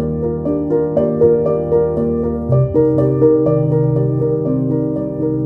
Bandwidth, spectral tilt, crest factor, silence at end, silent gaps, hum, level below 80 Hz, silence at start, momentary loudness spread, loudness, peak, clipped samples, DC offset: 2.5 kHz; -13 dB/octave; 14 dB; 0 s; none; none; -36 dBFS; 0 s; 6 LU; -15 LUFS; 0 dBFS; under 0.1%; under 0.1%